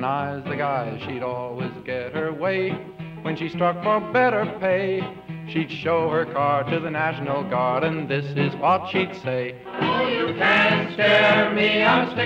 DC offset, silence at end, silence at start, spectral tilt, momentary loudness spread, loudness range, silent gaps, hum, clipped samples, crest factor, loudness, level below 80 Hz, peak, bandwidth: under 0.1%; 0 s; 0 s; -7 dB/octave; 12 LU; 7 LU; none; none; under 0.1%; 16 dB; -22 LUFS; -60 dBFS; -6 dBFS; 8.6 kHz